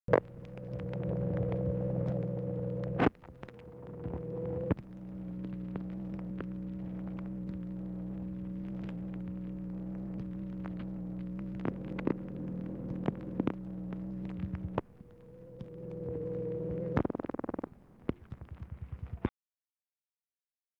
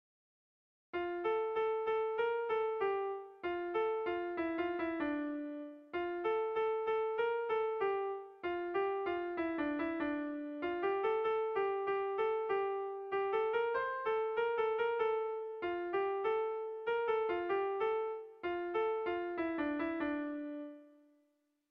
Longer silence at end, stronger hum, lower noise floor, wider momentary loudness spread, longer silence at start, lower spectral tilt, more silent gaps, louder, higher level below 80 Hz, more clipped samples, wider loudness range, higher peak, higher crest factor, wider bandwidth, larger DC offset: first, 1.5 s vs 0.85 s; neither; first, under -90 dBFS vs -78 dBFS; first, 13 LU vs 7 LU; second, 0.1 s vs 0.95 s; first, -10 dB/octave vs -2.5 dB/octave; neither; about the same, -38 LUFS vs -37 LUFS; first, -52 dBFS vs -72 dBFS; neither; first, 6 LU vs 2 LU; first, -10 dBFS vs -24 dBFS; first, 26 dB vs 12 dB; about the same, 5.4 kHz vs 5.4 kHz; neither